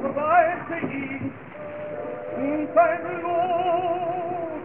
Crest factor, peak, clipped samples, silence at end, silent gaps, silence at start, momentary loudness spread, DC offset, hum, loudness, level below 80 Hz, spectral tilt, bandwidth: 18 dB; -6 dBFS; under 0.1%; 0 s; none; 0 s; 13 LU; 0.2%; none; -24 LUFS; -68 dBFS; -10.5 dB/octave; 3.5 kHz